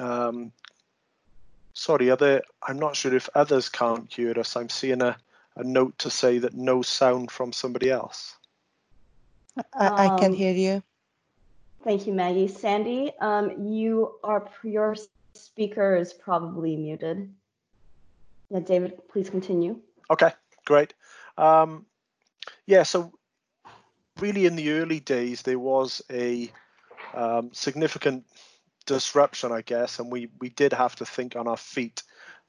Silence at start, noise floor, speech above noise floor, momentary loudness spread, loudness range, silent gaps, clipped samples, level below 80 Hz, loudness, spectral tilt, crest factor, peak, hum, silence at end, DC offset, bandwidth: 0 s; -76 dBFS; 51 dB; 16 LU; 5 LU; none; under 0.1%; -70 dBFS; -25 LUFS; -5 dB/octave; 20 dB; -6 dBFS; none; 0.15 s; under 0.1%; 10.5 kHz